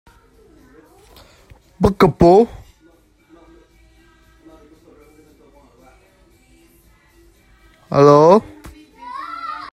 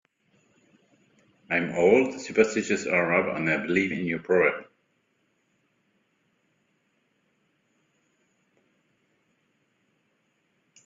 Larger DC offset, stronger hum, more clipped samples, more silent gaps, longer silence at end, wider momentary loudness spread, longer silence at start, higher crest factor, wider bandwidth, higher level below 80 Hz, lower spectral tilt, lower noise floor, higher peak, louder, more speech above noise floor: neither; neither; neither; neither; second, 0.1 s vs 6.25 s; first, 23 LU vs 7 LU; first, 1.8 s vs 1.5 s; about the same, 20 dB vs 22 dB; first, 16 kHz vs 7.6 kHz; first, -42 dBFS vs -68 dBFS; first, -7.5 dB/octave vs -5.5 dB/octave; second, -53 dBFS vs -72 dBFS; first, 0 dBFS vs -6 dBFS; first, -13 LUFS vs -24 LUFS; second, 42 dB vs 48 dB